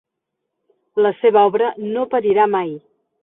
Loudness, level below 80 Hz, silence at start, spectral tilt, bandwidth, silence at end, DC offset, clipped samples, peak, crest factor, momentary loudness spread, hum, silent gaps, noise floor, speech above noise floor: -17 LUFS; -68 dBFS; 0.95 s; -10.5 dB/octave; 3.9 kHz; 0.45 s; under 0.1%; under 0.1%; -2 dBFS; 16 dB; 12 LU; none; none; -78 dBFS; 62 dB